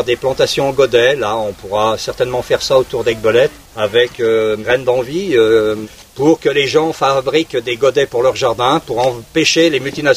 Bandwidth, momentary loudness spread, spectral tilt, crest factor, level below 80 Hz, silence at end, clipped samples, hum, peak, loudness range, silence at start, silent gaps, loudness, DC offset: 16 kHz; 6 LU; -4 dB/octave; 14 dB; -44 dBFS; 0 s; under 0.1%; none; 0 dBFS; 1 LU; 0 s; none; -14 LUFS; under 0.1%